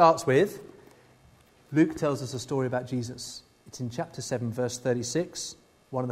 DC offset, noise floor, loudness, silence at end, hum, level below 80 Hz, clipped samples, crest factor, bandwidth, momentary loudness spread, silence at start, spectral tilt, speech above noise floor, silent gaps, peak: under 0.1%; -58 dBFS; -29 LUFS; 0 s; none; -64 dBFS; under 0.1%; 22 dB; 15.5 kHz; 14 LU; 0 s; -5.5 dB/octave; 31 dB; none; -6 dBFS